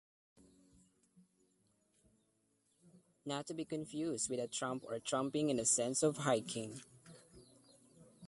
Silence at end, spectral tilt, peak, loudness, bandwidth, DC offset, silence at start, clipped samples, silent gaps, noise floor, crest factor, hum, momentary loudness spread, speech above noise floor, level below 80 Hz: 0 s; -3.5 dB/octave; -20 dBFS; -38 LUFS; 11.5 kHz; under 0.1%; 2.95 s; under 0.1%; none; -79 dBFS; 22 dB; none; 17 LU; 41 dB; -78 dBFS